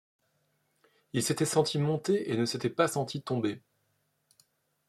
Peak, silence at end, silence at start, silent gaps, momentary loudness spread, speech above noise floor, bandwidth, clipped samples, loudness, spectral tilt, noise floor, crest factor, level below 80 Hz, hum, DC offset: -12 dBFS; 1.3 s; 1.15 s; none; 7 LU; 46 dB; 15 kHz; under 0.1%; -30 LUFS; -5 dB/octave; -76 dBFS; 22 dB; -72 dBFS; none; under 0.1%